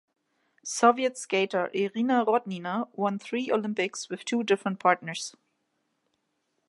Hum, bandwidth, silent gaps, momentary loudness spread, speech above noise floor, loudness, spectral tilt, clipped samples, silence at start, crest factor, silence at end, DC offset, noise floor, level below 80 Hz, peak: none; 11.5 kHz; none; 12 LU; 50 dB; -27 LUFS; -4 dB/octave; under 0.1%; 0.65 s; 22 dB; 1.4 s; under 0.1%; -77 dBFS; -82 dBFS; -6 dBFS